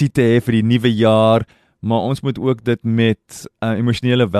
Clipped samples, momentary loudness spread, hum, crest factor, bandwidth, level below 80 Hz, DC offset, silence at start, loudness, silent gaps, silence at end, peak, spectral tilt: under 0.1%; 11 LU; none; 14 dB; 13 kHz; -48 dBFS; under 0.1%; 0 s; -16 LUFS; none; 0 s; -2 dBFS; -7 dB/octave